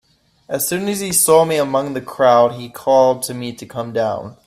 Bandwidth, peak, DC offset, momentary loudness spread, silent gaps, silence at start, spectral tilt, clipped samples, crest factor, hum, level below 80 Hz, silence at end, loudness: 16 kHz; 0 dBFS; under 0.1%; 13 LU; none; 0.5 s; -3.5 dB/octave; under 0.1%; 16 dB; none; -58 dBFS; 0.15 s; -16 LUFS